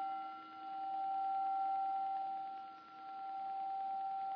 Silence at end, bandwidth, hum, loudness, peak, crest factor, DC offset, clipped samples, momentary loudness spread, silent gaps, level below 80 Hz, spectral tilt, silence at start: 0 s; 5.2 kHz; none; -41 LUFS; -32 dBFS; 10 dB; under 0.1%; under 0.1%; 12 LU; none; under -90 dBFS; -1 dB/octave; 0 s